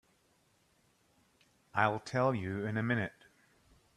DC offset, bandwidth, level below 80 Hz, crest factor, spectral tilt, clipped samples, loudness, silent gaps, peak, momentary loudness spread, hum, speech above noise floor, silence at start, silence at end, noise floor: under 0.1%; 12.5 kHz; -72 dBFS; 26 dB; -7 dB/octave; under 0.1%; -34 LUFS; none; -12 dBFS; 6 LU; none; 39 dB; 1.75 s; 0.85 s; -72 dBFS